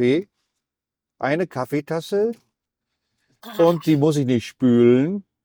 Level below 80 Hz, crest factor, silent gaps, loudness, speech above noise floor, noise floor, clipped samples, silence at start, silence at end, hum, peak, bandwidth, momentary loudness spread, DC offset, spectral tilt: -62 dBFS; 18 dB; none; -20 LUFS; 68 dB; -87 dBFS; under 0.1%; 0 s; 0.25 s; none; -4 dBFS; over 20 kHz; 10 LU; under 0.1%; -7 dB/octave